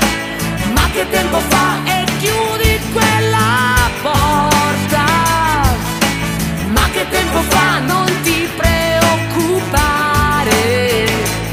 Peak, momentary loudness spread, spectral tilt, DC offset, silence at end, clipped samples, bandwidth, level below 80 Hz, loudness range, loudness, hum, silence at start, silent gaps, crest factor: 0 dBFS; 3 LU; -4 dB/octave; under 0.1%; 0 s; under 0.1%; 15.5 kHz; -26 dBFS; 1 LU; -14 LUFS; none; 0 s; none; 14 dB